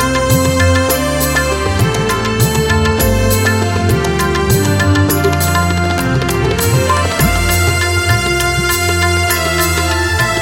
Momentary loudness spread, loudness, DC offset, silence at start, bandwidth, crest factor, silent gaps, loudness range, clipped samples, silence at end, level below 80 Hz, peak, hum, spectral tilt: 2 LU; -13 LUFS; under 0.1%; 0 s; 17 kHz; 12 dB; none; 1 LU; under 0.1%; 0 s; -24 dBFS; 0 dBFS; none; -4.5 dB/octave